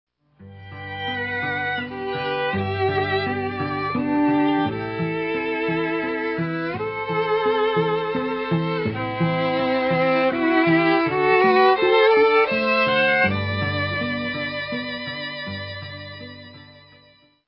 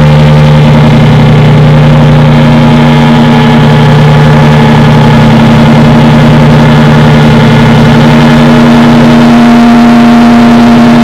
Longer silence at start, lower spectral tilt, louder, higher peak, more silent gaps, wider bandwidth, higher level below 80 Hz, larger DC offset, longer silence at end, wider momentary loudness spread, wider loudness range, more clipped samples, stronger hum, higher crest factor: first, 0.4 s vs 0 s; first, -10.5 dB/octave vs -7.5 dB/octave; second, -21 LUFS vs -2 LUFS; second, -4 dBFS vs 0 dBFS; neither; second, 5.8 kHz vs 10 kHz; second, -50 dBFS vs -18 dBFS; neither; first, 0.75 s vs 0 s; first, 13 LU vs 1 LU; first, 8 LU vs 1 LU; second, under 0.1% vs 30%; neither; first, 18 dB vs 2 dB